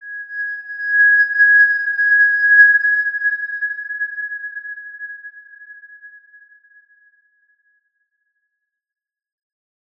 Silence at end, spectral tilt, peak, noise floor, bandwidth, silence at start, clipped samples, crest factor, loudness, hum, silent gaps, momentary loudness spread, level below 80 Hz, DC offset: 3.9 s; 2 dB/octave; -2 dBFS; -77 dBFS; 5.2 kHz; 0 s; under 0.1%; 18 dB; -13 LUFS; none; none; 21 LU; -88 dBFS; under 0.1%